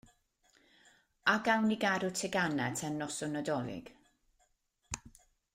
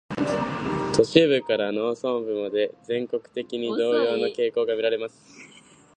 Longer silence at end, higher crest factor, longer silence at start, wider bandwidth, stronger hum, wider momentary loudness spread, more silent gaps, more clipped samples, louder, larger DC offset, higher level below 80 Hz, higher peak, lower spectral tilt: about the same, 0.45 s vs 0.5 s; about the same, 22 dB vs 22 dB; first, 1.25 s vs 0.1 s; first, 16 kHz vs 9.8 kHz; neither; first, 15 LU vs 10 LU; neither; neither; second, -34 LUFS vs -24 LUFS; neither; second, -68 dBFS vs -58 dBFS; second, -14 dBFS vs -2 dBFS; second, -4 dB/octave vs -5.5 dB/octave